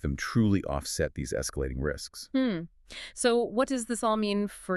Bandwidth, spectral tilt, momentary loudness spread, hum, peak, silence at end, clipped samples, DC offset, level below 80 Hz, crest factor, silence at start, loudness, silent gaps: 13.5 kHz; -5 dB/octave; 10 LU; none; -14 dBFS; 0 s; under 0.1%; under 0.1%; -44 dBFS; 16 dB; 0.05 s; -29 LUFS; none